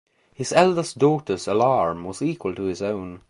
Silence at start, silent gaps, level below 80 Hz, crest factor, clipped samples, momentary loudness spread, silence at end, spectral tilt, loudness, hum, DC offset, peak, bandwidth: 0.4 s; none; -54 dBFS; 20 dB; under 0.1%; 9 LU; 0.1 s; -5.5 dB/octave; -22 LUFS; none; under 0.1%; -2 dBFS; 11.5 kHz